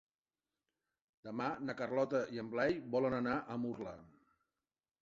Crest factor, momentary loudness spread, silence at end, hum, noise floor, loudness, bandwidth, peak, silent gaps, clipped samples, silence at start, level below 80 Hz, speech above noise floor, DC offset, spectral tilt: 18 dB; 12 LU; 0.95 s; none; under -90 dBFS; -38 LUFS; 7.6 kHz; -22 dBFS; none; under 0.1%; 1.25 s; -72 dBFS; over 52 dB; under 0.1%; -5 dB/octave